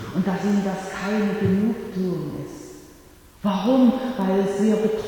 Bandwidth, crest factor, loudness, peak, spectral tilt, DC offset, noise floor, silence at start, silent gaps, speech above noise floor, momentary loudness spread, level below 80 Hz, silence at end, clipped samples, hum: 18.5 kHz; 16 dB; -22 LUFS; -8 dBFS; -7 dB/octave; under 0.1%; -48 dBFS; 0 s; none; 27 dB; 13 LU; -52 dBFS; 0 s; under 0.1%; none